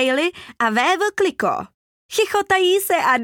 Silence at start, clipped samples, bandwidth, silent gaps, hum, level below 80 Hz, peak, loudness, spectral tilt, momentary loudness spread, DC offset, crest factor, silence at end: 0 s; under 0.1%; 18.5 kHz; 1.74-2.09 s; none; -60 dBFS; -4 dBFS; -19 LUFS; -2.5 dB/octave; 8 LU; under 0.1%; 14 dB; 0 s